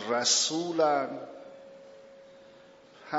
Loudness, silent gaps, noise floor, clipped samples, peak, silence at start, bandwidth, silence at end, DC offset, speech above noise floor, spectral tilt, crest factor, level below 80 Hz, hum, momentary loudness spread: -26 LUFS; none; -54 dBFS; under 0.1%; -10 dBFS; 0 s; 8 kHz; 0 s; under 0.1%; 27 dB; -1 dB/octave; 20 dB; -82 dBFS; none; 25 LU